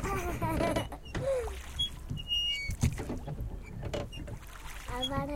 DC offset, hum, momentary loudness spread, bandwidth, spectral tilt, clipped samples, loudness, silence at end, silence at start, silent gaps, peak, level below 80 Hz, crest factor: under 0.1%; none; 12 LU; 17 kHz; -4.5 dB/octave; under 0.1%; -34 LUFS; 0 s; 0 s; none; -14 dBFS; -42 dBFS; 20 dB